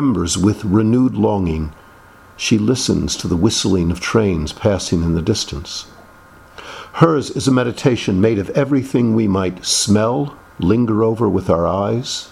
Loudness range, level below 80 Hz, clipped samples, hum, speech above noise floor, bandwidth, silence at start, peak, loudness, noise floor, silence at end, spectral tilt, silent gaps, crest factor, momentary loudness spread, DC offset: 3 LU; -38 dBFS; under 0.1%; none; 27 dB; 14 kHz; 0 s; 0 dBFS; -17 LUFS; -44 dBFS; 0.05 s; -5.5 dB/octave; none; 16 dB; 8 LU; under 0.1%